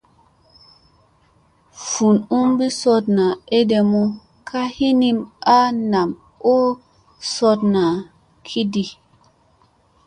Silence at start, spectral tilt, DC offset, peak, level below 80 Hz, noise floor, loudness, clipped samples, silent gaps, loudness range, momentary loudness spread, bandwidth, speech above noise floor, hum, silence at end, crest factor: 1.75 s; -5.5 dB/octave; under 0.1%; -2 dBFS; -58 dBFS; -57 dBFS; -18 LUFS; under 0.1%; none; 3 LU; 11 LU; 11 kHz; 40 dB; none; 1.15 s; 16 dB